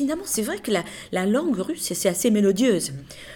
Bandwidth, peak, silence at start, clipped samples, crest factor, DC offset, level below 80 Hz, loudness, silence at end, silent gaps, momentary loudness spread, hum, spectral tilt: 19 kHz; -8 dBFS; 0 s; under 0.1%; 16 dB; under 0.1%; -56 dBFS; -23 LUFS; 0 s; none; 7 LU; none; -4.5 dB/octave